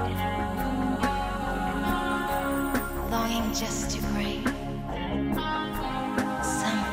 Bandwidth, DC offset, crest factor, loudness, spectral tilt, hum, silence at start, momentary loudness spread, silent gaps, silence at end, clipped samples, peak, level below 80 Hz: 16 kHz; under 0.1%; 16 dB; -29 LUFS; -4.5 dB/octave; none; 0 s; 3 LU; none; 0 s; under 0.1%; -12 dBFS; -38 dBFS